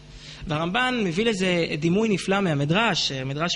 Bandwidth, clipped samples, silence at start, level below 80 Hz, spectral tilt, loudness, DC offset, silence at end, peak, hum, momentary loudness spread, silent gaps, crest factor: 11.5 kHz; under 0.1%; 0 s; -50 dBFS; -5 dB/octave; -23 LUFS; under 0.1%; 0 s; -8 dBFS; none; 7 LU; none; 16 dB